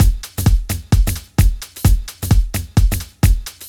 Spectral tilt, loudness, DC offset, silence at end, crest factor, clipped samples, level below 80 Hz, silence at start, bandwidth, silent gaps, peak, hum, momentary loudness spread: -5.5 dB/octave; -18 LUFS; under 0.1%; 0 s; 14 dB; under 0.1%; -18 dBFS; 0 s; 18.5 kHz; none; 0 dBFS; none; 2 LU